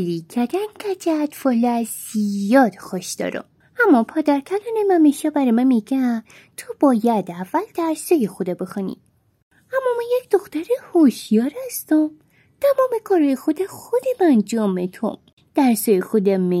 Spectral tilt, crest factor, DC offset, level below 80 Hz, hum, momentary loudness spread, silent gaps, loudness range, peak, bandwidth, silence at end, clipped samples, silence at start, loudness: -6 dB/octave; 16 dB; under 0.1%; -70 dBFS; none; 11 LU; 9.42-9.51 s, 15.33-15.37 s; 4 LU; -2 dBFS; 16.5 kHz; 0 s; under 0.1%; 0 s; -20 LUFS